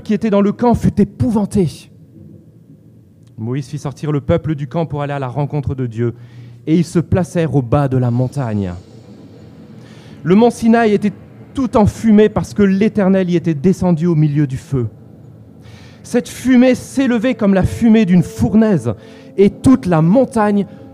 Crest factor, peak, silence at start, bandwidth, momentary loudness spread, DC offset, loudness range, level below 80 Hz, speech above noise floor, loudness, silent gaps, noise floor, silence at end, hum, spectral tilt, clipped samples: 14 dB; 0 dBFS; 0.05 s; 13.5 kHz; 11 LU; under 0.1%; 7 LU; -40 dBFS; 30 dB; -15 LUFS; none; -44 dBFS; 0.05 s; none; -8 dB/octave; under 0.1%